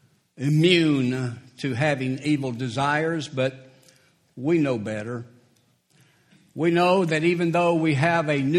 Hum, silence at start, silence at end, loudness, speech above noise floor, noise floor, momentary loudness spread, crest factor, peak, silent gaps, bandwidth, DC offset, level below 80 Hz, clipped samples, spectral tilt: none; 0.4 s; 0 s; -23 LUFS; 41 dB; -63 dBFS; 12 LU; 20 dB; -4 dBFS; none; 12 kHz; under 0.1%; -64 dBFS; under 0.1%; -6.5 dB/octave